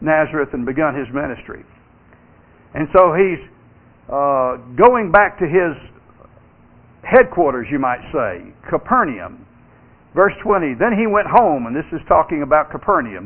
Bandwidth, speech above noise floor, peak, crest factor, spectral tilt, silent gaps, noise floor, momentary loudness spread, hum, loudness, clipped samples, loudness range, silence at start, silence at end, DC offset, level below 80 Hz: 4 kHz; 32 dB; 0 dBFS; 18 dB; -10.5 dB/octave; none; -48 dBFS; 14 LU; none; -16 LUFS; under 0.1%; 4 LU; 0 s; 0 s; under 0.1%; -44 dBFS